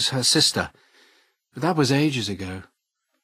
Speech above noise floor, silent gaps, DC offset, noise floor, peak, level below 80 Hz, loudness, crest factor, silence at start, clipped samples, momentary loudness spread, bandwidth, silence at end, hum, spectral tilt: 54 dB; none; under 0.1%; -76 dBFS; -6 dBFS; -58 dBFS; -21 LUFS; 18 dB; 0 s; under 0.1%; 16 LU; 15.5 kHz; 0.6 s; none; -3.5 dB/octave